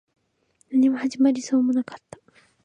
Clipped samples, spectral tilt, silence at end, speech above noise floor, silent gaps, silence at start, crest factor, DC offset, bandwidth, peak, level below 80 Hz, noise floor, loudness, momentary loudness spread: under 0.1%; -4.5 dB/octave; 0.65 s; 45 dB; none; 0.7 s; 14 dB; under 0.1%; 9.6 kHz; -10 dBFS; -72 dBFS; -66 dBFS; -22 LUFS; 11 LU